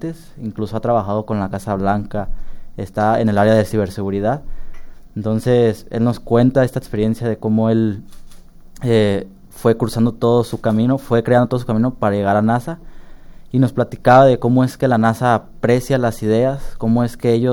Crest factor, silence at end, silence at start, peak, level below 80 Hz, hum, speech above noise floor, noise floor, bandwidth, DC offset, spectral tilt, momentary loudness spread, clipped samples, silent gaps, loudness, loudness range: 16 dB; 0 s; 0 s; 0 dBFS; -36 dBFS; none; 21 dB; -37 dBFS; 17.5 kHz; under 0.1%; -7.5 dB/octave; 12 LU; under 0.1%; none; -17 LUFS; 4 LU